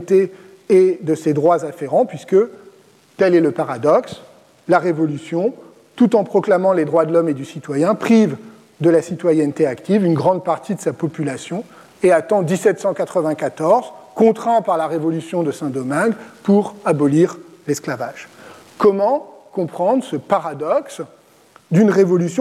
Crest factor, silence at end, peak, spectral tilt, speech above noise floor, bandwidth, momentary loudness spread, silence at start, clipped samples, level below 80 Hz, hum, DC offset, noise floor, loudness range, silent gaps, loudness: 14 dB; 0 s; -2 dBFS; -7 dB/octave; 33 dB; 14 kHz; 10 LU; 0 s; under 0.1%; -66 dBFS; none; under 0.1%; -50 dBFS; 3 LU; none; -17 LUFS